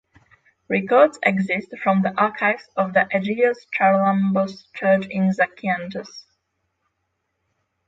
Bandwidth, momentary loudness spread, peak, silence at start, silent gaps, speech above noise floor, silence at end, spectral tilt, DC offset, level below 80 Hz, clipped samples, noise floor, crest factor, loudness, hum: 7.8 kHz; 8 LU; -2 dBFS; 0.7 s; none; 55 dB; 1.65 s; -7.5 dB/octave; under 0.1%; -66 dBFS; under 0.1%; -75 dBFS; 18 dB; -20 LUFS; none